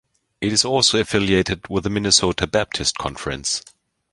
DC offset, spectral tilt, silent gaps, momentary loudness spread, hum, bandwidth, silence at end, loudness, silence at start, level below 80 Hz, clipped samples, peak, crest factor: under 0.1%; -3 dB/octave; none; 10 LU; none; 11.5 kHz; 0.5 s; -19 LUFS; 0.4 s; -42 dBFS; under 0.1%; -2 dBFS; 20 dB